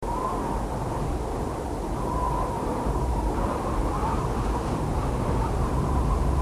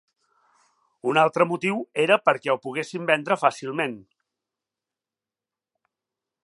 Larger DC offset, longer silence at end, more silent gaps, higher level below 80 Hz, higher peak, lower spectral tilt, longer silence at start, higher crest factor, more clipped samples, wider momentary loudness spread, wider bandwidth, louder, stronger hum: neither; second, 0 s vs 2.4 s; neither; first, -30 dBFS vs -78 dBFS; second, -12 dBFS vs -2 dBFS; first, -7 dB/octave vs -5 dB/octave; second, 0 s vs 1.05 s; second, 14 dB vs 24 dB; neither; second, 4 LU vs 10 LU; first, 14 kHz vs 11.5 kHz; second, -28 LUFS vs -23 LUFS; neither